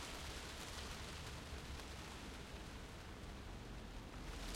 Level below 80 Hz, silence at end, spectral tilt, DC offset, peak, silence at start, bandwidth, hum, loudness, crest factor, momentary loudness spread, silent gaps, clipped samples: -54 dBFS; 0 s; -3.5 dB/octave; under 0.1%; -36 dBFS; 0 s; 16.5 kHz; none; -51 LUFS; 16 dB; 4 LU; none; under 0.1%